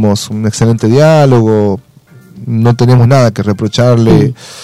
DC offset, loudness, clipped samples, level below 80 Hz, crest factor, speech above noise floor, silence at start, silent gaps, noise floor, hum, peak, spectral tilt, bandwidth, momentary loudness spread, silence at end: 1%; -9 LUFS; under 0.1%; -38 dBFS; 8 dB; 30 dB; 0 s; none; -38 dBFS; none; 0 dBFS; -7 dB/octave; 12.5 kHz; 9 LU; 0 s